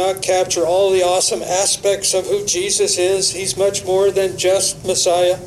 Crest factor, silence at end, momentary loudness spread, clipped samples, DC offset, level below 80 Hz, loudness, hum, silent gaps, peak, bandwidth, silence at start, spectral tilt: 12 dB; 0 s; 3 LU; under 0.1%; under 0.1%; -50 dBFS; -16 LUFS; none; none; -4 dBFS; 14 kHz; 0 s; -2 dB/octave